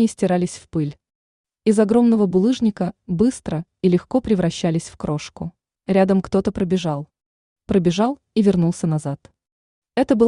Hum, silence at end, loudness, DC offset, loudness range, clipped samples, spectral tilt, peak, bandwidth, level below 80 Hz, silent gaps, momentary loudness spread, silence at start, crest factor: none; 0 s; -20 LUFS; under 0.1%; 3 LU; under 0.1%; -7 dB/octave; -4 dBFS; 11 kHz; -48 dBFS; 1.15-1.44 s, 7.26-7.56 s, 9.52-9.82 s; 12 LU; 0 s; 16 dB